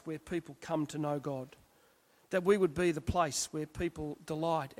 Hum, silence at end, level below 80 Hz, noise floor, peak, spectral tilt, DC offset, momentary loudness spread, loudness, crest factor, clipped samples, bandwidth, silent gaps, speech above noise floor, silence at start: none; 0.05 s; -56 dBFS; -67 dBFS; -16 dBFS; -5 dB/octave; under 0.1%; 11 LU; -34 LUFS; 20 dB; under 0.1%; 16 kHz; none; 33 dB; 0.05 s